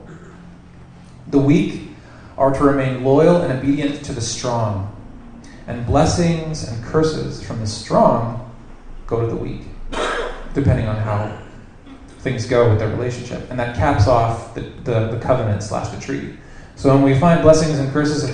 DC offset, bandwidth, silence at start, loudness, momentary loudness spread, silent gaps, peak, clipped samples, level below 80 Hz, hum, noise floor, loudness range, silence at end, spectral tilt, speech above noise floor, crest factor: under 0.1%; 10 kHz; 0 s; -18 LUFS; 16 LU; none; 0 dBFS; under 0.1%; -36 dBFS; none; -41 dBFS; 5 LU; 0 s; -6.5 dB/octave; 24 dB; 18 dB